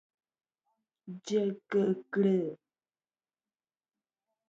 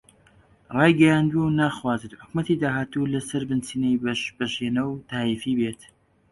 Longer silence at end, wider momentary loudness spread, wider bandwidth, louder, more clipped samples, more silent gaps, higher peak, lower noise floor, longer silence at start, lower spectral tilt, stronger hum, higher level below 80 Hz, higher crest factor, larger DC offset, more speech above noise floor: first, 1.95 s vs 0.55 s; first, 14 LU vs 11 LU; second, 7.8 kHz vs 11.5 kHz; second, -31 LUFS vs -24 LUFS; neither; neither; second, -18 dBFS vs -4 dBFS; first, under -90 dBFS vs -57 dBFS; first, 1.05 s vs 0.7 s; about the same, -7 dB/octave vs -6 dB/octave; neither; second, -84 dBFS vs -56 dBFS; about the same, 18 dB vs 20 dB; neither; first, over 60 dB vs 34 dB